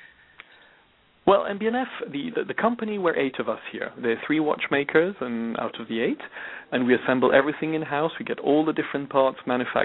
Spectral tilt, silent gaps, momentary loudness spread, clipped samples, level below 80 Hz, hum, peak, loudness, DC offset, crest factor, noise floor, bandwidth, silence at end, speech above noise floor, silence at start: -9.5 dB/octave; none; 9 LU; under 0.1%; -64 dBFS; none; -4 dBFS; -25 LUFS; under 0.1%; 20 dB; -60 dBFS; 4.1 kHz; 0 s; 35 dB; 0 s